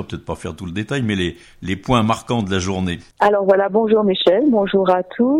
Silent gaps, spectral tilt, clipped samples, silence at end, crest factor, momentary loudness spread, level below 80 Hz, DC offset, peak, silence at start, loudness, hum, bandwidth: none; -6 dB/octave; under 0.1%; 0 s; 16 dB; 12 LU; -44 dBFS; under 0.1%; -2 dBFS; 0 s; -18 LUFS; none; 12 kHz